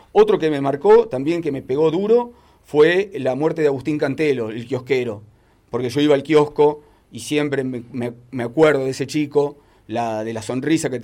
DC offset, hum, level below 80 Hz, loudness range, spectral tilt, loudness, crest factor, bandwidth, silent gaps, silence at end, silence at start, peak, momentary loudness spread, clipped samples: under 0.1%; none; -56 dBFS; 4 LU; -6 dB/octave; -19 LUFS; 14 dB; 13 kHz; none; 0 s; 0.15 s; -4 dBFS; 13 LU; under 0.1%